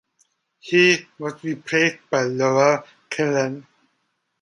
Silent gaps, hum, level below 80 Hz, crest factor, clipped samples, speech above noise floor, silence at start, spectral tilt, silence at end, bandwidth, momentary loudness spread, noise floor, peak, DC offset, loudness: none; none; -70 dBFS; 20 dB; under 0.1%; 52 dB; 0.65 s; -4.5 dB/octave; 0.8 s; 11 kHz; 14 LU; -72 dBFS; -2 dBFS; under 0.1%; -20 LUFS